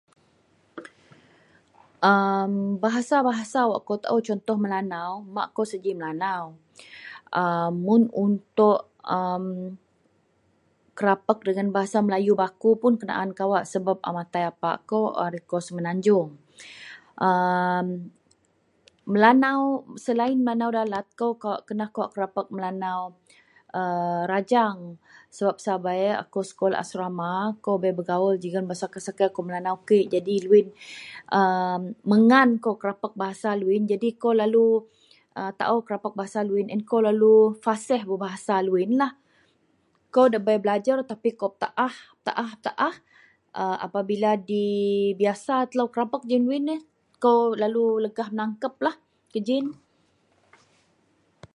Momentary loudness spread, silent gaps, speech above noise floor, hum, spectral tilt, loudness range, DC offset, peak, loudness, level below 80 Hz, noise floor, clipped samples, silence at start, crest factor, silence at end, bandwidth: 12 LU; none; 43 dB; none; -6.5 dB/octave; 5 LU; under 0.1%; -2 dBFS; -24 LUFS; -74 dBFS; -66 dBFS; under 0.1%; 0.75 s; 22 dB; 1.8 s; 11.5 kHz